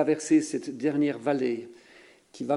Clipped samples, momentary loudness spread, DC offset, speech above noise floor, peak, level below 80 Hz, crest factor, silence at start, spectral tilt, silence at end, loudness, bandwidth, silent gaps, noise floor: under 0.1%; 13 LU; under 0.1%; 28 dB; -12 dBFS; -74 dBFS; 16 dB; 0 s; -5.5 dB/octave; 0 s; -27 LUFS; 11.5 kHz; none; -54 dBFS